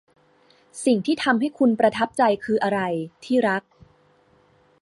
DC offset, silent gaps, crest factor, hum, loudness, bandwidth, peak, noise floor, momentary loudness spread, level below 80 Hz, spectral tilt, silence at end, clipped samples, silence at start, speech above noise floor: under 0.1%; none; 18 dB; none; -22 LUFS; 11.5 kHz; -6 dBFS; -59 dBFS; 8 LU; -64 dBFS; -5 dB/octave; 1.2 s; under 0.1%; 0.75 s; 38 dB